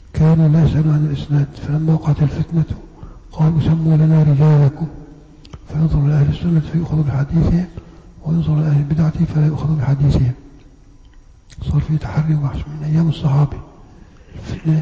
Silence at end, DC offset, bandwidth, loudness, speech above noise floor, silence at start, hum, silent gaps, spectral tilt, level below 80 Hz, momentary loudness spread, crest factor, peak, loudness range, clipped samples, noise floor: 0 s; under 0.1%; 7 kHz; -16 LUFS; 28 dB; 0.15 s; none; none; -9.5 dB/octave; -32 dBFS; 14 LU; 8 dB; -8 dBFS; 4 LU; under 0.1%; -43 dBFS